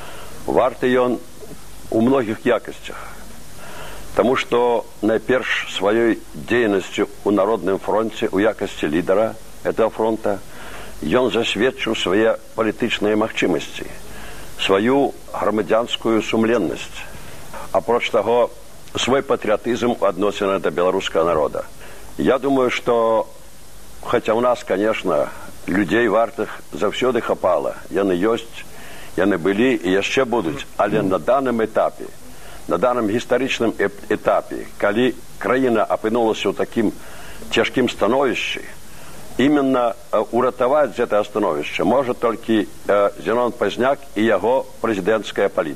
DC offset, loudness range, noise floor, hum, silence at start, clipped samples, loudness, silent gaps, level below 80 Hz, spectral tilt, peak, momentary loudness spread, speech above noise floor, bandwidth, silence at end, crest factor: 2%; 2 LU; -43 dBFS; none; 0 s; under 0.1%; -19 LUFS; none; -48 dBFS; -5 dB/octave; 0 dBFS; 17 LU; 24 dB; 15.5 kHz; 0 s; 20 dB